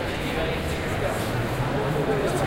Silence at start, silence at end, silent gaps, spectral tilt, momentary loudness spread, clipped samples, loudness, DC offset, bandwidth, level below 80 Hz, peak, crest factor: 0 s; 0 s; none; -5.5 dB/octave; 3 LU; under 0.1%; -26 LUFS; under 0.1%; 16 kHz; -38 dBFS; -12 dBFS; 14 dB